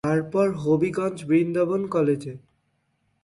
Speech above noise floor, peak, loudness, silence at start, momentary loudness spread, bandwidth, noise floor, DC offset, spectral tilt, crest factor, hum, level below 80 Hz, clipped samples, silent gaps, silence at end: 48 dB; -10 dBFS; -23 LUFS; 0.05 s; 6 LU; 11.5 kHz; -71 dBFS; under 0.1%; -8 dB/octave; 14 dB; none; -62 dBFS; under 0.1%; none; 0.85 s